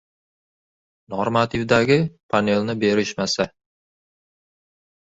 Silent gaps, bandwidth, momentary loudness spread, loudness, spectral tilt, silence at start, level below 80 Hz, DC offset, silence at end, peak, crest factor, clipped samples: 2.23-2.29 s; 8 kHz; 8 LU; -21 LUFS; -5 dB/octave; 1.1 s; -54 dBFS; under 0.1%; 1.65 s; -2 dBFS; 20 dB; under 0.1%